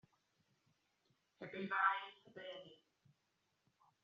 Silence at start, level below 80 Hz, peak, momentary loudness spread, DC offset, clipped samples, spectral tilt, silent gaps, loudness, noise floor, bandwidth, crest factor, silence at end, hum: 1.4 s; under -90 dBFS; -20 dBFS; 19 LU; under 0.1%; under 0.1%; -1.5 dB/octave; none; -40 LUFS; -84 dBFS; 7.2 kHz; 26 dB; 1.3 s; none